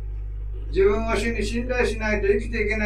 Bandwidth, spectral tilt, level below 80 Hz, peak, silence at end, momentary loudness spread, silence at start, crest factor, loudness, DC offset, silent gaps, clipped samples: 12 kHz; -6 dB/octave; -30 dBFS; -8 dBFS; 0 s; 13 LU; 0 s; 16 dB; -23 LUFS; under 0.1%; none; under 0.1%